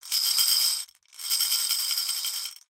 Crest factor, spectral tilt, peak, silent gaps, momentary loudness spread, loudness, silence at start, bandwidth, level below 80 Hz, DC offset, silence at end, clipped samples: 18 dB; 5.5 dB/octave; -8 dBFS; none; 12 LU; -23 LUFS; 0.05 s; 17 kHz; -72 dBFS; under 0.1%; 0.2 s; under 0.1%